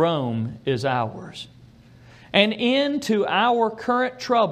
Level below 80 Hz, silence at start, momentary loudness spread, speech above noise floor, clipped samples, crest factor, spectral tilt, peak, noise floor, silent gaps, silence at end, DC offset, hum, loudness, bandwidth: -60 dBFS; 0 s; 13 LU; 27 dB; under 0.1%; 22 dB; -5.5 dB/octave; -2 dBFS; -49 dBFS; none; 0 s; under 0.1%; none; -22 LUFS; 15 kHz